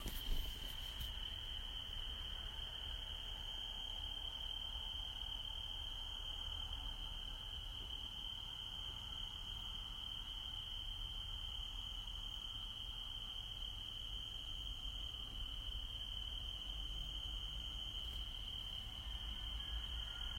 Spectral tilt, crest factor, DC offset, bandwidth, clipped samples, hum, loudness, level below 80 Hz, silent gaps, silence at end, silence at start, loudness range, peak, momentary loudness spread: -2.5 dB/octave; 18 dB; under 0.1%; 16 kHz; under 0.1%; none; -45 LUFS; -50 dBFS; none; 0 s; 0 s; 1 LU; -30 dBFS; 2 LU